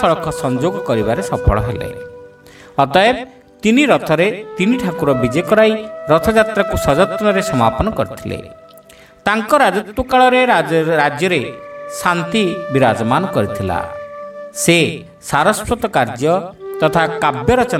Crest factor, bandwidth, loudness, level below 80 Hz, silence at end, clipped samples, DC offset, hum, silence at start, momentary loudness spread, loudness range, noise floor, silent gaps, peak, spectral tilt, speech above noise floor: 16 dB; 16.5 kHz; -15 LUFS; -34 dBFS; 0 s; under 0.1%; under 0.1%; none; 0 s; 13 LU; 3 LU; -43 dBFS; none; 0 dBFS; -5 dB/octave; 28 dB